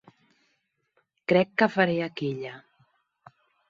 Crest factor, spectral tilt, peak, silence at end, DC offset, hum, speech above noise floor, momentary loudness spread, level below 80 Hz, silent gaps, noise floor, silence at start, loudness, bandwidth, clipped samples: 22 dB; -7.5 dB/octave; -6 dBFS; 1.1 s; under 0.1%; none; 50 dB; 14 LU; -72 dBFS; none; -74 dBFS; 1.3 s; -25 LUFS; 7.4 kHz; under 0.1%